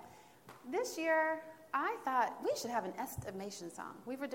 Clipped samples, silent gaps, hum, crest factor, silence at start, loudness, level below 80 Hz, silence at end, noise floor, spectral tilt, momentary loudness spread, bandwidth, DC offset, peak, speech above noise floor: under 0.1%; none; none; 18 dB; 0 s; -38 LUFS; -72 dBFS; 0 s; -58 dBFS; -4 dB/octave; 14 LU; 16.5 kHz; under 0.1%; -20 dBFS; 21 dB